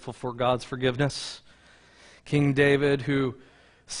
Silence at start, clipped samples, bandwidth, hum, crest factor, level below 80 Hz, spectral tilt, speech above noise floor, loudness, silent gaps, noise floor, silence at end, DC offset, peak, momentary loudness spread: 0 s; under 0.1%; 10.5 kHz; none; 20 dB; -56 dBFS; -5.5 dB/octave; 30 dB; -25 LUFS; none; -56 dBFS; 0 s; under 0.1%; -8 dBFS; 15 LU